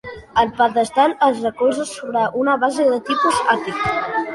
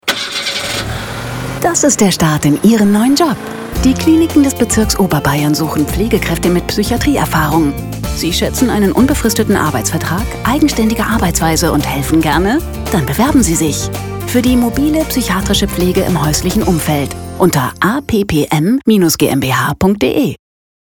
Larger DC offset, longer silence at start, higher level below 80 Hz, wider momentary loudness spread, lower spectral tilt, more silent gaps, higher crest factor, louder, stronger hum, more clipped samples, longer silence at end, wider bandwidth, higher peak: neither; about the same, 0.05 s vs 0.05 s; second, -50 dBFS vs -28 dBFS; about the same, 5 LU vs 7 LU; about the same, -4 dB/octave vs -4.5 dB/octave; neither; about the same, 16 dB vs 12 dB; second, -18 LUFS vs -13 LUFS; neither; neither; second, 0 s vs 0.6 s; second, 11.5 kHz vs over 20 kHz; about the same, -2 dBFS vs 0 dBFS